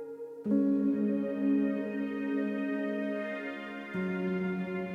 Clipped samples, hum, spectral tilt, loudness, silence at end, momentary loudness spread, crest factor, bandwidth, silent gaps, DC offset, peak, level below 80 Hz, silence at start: under 0.1%; none; -9 dB/octave; -32 LUFS; 0 s; 9 LU; 14 dB; 5.2 kHz; none; under 0.1%; -18 dBFS; -72 dBFS; 0 s